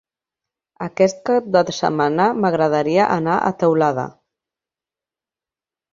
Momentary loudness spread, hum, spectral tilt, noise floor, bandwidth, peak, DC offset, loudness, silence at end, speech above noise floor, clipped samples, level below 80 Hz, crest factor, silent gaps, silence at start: 7 LU; none; -6 dB/octave; -90 dBFS; 7.4 kHz; -2 dBFS; under 0.1%; -18 LUFS; 1.85 s; 73 dB; under 0.1%; -62 dBFS; 18 dB; none; 0.8 s